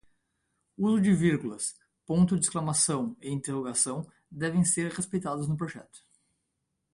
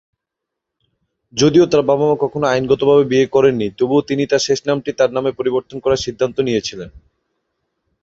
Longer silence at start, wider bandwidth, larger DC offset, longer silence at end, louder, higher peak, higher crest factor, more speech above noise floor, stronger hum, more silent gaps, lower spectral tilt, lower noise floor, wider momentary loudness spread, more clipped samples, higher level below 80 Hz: second, 0.8 s vs 1.35 s; first, 11.5 kHz vs 7.8 kHz; neither; about the same, 0.95 s vs 1.05 s; second, -28 LUFS vs -16 LUFS; second, -10 dBFS vs -2 dBFS; about the same, 20 dB vs 16 dB; second, 53 dB vs 66 dB; neither; neither; about the same, -5 dB/octave vs -5.5 dB/octave; about the same, -81 dBFS vs -81 dBFS; first, 11 LU vs 8 LU; neither; second, -60 dBFS vs -50 dBFS